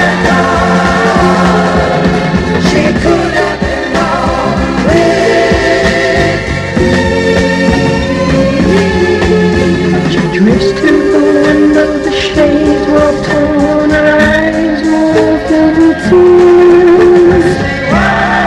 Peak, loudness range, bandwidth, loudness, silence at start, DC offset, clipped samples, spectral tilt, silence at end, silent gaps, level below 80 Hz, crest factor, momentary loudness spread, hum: 0 dBFS; 3 LU; 11 kHz; -8 LUFS; 0 s; under 0.1%; 0.3%; -6 dB/octave; 0 s; none; -26 dBFS; 8 dB; 6 LU; none